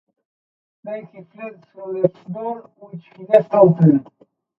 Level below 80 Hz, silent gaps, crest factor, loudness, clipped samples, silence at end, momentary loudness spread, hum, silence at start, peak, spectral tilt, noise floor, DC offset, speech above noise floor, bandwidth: -64 dBFS; none; 20 dB; -17 LUFS; under 0.1%; 0.55 s; 26 LU; none; 0.85 s; 0 dBFS; -11.5 dB/octave; under -90 dBFS; under 0.1%; over 72 dB; 4.1 kHz